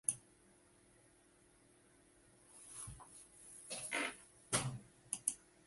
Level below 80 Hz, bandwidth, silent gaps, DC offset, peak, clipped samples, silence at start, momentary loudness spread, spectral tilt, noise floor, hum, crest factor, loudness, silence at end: -72 dBFS; 12 kHz; none; under 0.1%; -16 dBFS; under 0.1%; 0.05 s; 18 LU; -2 dB/octave; -69 dBFS; none; 32 dB; -43 LUFS; 0.25 s